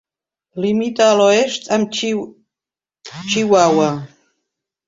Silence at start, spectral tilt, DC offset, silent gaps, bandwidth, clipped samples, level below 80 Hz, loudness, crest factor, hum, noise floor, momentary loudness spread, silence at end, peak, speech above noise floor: 0.55 s; -4 dB/octave; under 0.1%; none; 7.8 kHz; under 0.1%; -62 dBFS; -16 LUFS; 16 dB; none; -90 dBFS; 17 LU; 0.8 s; -2 dBFS; 74 dB